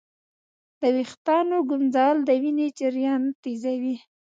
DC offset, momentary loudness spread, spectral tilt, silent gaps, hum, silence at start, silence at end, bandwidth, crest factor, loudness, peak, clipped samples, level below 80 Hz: under 0.1%; 8 LU; -5 dB/octave; 1.17-1.25 s, 3.35-3.43 s; none; 0.8 s; 0.25 s; 7.8 kHz; 16 dB; -24 LUFS; -8 dBFS; under 0.1%; -80 dBFS